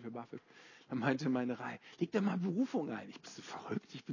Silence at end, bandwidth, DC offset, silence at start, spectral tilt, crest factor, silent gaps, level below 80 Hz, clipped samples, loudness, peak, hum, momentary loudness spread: 0 s; 7.4 kHz; under 0.1%; 0 s; -6.5 dB/octave; 20 dB; none; -82 dBFS; under 0.1%; -38 LUFS; -18 dBFS; none; 16 LU